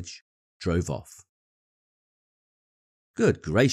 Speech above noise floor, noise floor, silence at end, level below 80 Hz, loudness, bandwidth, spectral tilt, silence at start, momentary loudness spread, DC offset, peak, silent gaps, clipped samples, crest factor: over 65 dB; under -90 dBFS; 0 s; -50 dBFS; -27 LUFS; 13.5 kHz; -6 dB/octave; 0 s; 19 LU; under 0.1%; -8 dBFS; 0.21-0.60 s, 1.29-3.14 s; under 0.1%; 22 dB